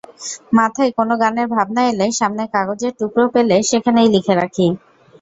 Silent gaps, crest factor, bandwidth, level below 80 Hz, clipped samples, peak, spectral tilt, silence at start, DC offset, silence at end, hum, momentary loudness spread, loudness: none; 14 dB; 8 kHz; -56 dBFS; under 0.1%; -2 dBFS; -4.5 dB/octave; 0.2 s; under 0.1%; 0.45 s; none; 7 LU; -16 LUFS